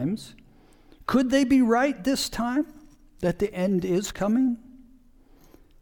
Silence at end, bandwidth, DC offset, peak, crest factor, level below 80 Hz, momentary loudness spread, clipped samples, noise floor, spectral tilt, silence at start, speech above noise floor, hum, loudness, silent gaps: 1.05 s; 19 kHz; under 0.1%; -8 dBFS; 18 dB; -50 dBFS; 15 LU; under 0.1%; -54 dBFS; -5.5 dB/octave; 0 s; 31 dB; none; -25 LUFS; none